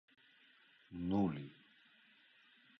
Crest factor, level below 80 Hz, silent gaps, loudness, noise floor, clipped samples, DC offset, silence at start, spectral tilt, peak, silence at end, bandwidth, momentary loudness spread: 20 dB; -68 dBFS; none; -40 LUFS; -68 dBFS; under 0.1%; under 0.1%; 0.9 s; -7.5 dB/octave; -24 dBFS; 1.25 s; 6 kHz; 20 LU